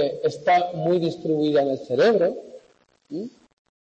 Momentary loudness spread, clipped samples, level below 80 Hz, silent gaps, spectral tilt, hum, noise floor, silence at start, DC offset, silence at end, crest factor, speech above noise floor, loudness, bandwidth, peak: 16 LU; under 0.1%; -70 dBFS; none; -6.5 dB/octave; none; -60 dBFS; 0 s; under 0.1%; 0.65 s; 14 dB; 38 dB; -22 LUFS; 8.6 kHz; -10 dBFS